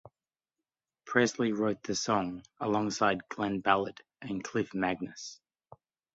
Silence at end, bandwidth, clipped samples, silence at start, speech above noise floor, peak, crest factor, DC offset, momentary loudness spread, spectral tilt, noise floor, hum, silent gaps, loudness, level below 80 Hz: 0.8 s; 8.2 kHz; under 0.1%; 0.05 s; over 59 dB; -10 dBFS; 24 dB; under 0.1%; 12 LU; -4.5 dB/octave; under -90 dBFS; none; none; -31 LUFS; -66 dBFS